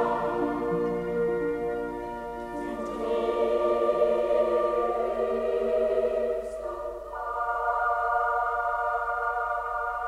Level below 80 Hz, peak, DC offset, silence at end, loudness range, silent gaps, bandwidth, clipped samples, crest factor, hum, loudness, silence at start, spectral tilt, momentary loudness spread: -52 dBFS; -12 dBFS; under 0.1%; 0 s; 3 LU; none; 12.5 kHz; under 0.1%; 16 dB; none; -28 LUFS; 0 s; -6.5 dB/octave; 10 LU